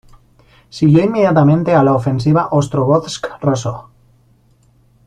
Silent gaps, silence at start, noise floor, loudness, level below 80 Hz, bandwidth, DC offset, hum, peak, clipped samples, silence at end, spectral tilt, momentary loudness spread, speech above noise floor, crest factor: none; 0.75 s; -52 dBFS; -14 LUFS; -48 dBFS; 10 kHz; under 0.1%; none; -2 dBFS; under 0.1%; 1.25 s; -7.5 dB/octave; 12 LU; 39 dB; 14 dB